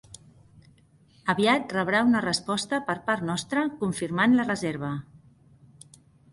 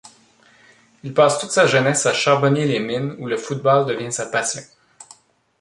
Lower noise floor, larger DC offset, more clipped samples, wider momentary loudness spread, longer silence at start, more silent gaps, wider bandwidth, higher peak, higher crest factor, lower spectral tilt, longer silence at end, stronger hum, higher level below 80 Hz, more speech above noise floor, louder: first, -59 dBFS vs -53 dBFS; neither; neither; about the same, 8 LU vs 10 LU; first, 1.25 s vs 1.05 s; neither; about the same, 11.5 kHz vs 11.5 kHz; second, -10 dBFS vs 0 dBFS; about the same, 18 dB vs 20 dB; about the same, -4.5 dB/octave vs -4 dB/octave; first, 1.15 s vs 0.55 s; neither; about the same, -62 dBFS vs -64 dBFS; about the same, 33 dB vs 35 dB; second, -25 LUFS vs -18 LUFS